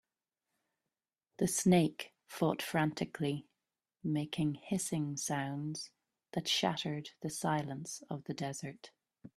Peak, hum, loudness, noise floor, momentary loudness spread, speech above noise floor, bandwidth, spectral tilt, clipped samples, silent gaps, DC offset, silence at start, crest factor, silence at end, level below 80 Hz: -16 dBFS; none; -36 LUFS; under -90 dBFS; 12 LU; over 55 dB; 15 kHz; -4.5 dB/octave; under 0.1%; none; under 0.1%; 1.4 s; 22 dB; 0.1 s; -72 dBFS